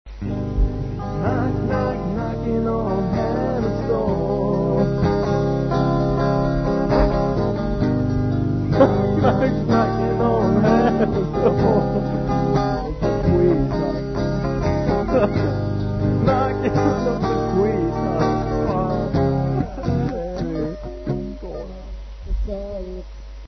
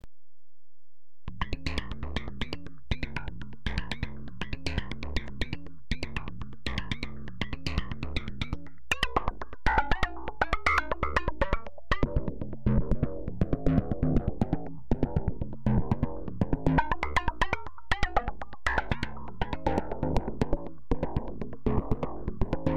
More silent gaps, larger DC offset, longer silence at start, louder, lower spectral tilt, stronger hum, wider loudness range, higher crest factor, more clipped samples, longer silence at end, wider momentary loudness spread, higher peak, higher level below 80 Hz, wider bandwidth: neither; second, under 0.1% vs 2%; about the same, 0.05 s vs 0 s; first, -20 LUFS vs -32 LUFS; first, -9 dB/octave vs -6.5 dB/octave; neither; about the same, 5 LU vs 7 LU; about the same, 18 dB vs 20 dB; neither; about the same, 0 s vs 0 s; about the same, 10 LU vs 10 LU; first, -2 dBFS vs -10 dBFS; first, -30 dBFS vs -36 dBFS; second, 6.4 kHz vs 11 kHz